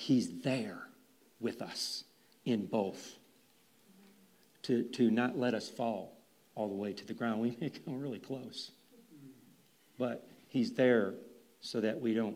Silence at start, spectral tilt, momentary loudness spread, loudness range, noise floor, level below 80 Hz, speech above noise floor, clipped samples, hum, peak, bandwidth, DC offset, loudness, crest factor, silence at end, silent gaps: 0 s; -5.5 dB/octave; 19 LU; 5 LU; -67 dBFS; -88 dBFS; 33 dB; under 0.1%; none; -16 dBFS; 15.5 kHz; under 0.1%; -36 LUFS; 20 dB; 0 s; none